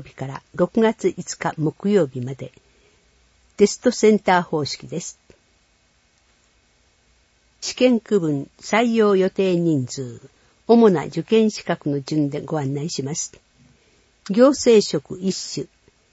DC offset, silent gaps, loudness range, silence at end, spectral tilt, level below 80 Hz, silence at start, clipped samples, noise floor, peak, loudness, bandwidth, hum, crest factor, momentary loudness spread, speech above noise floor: under 0.1%; none; 6 LU; 0.45 s; -5.5 dB/octave; -60 dBFS; 0 s; under 0.1%; -61 dBFS; -2 dBFS; -20 LUFS; 8 kHz; none; 18 dB; 16 LU; 42 dB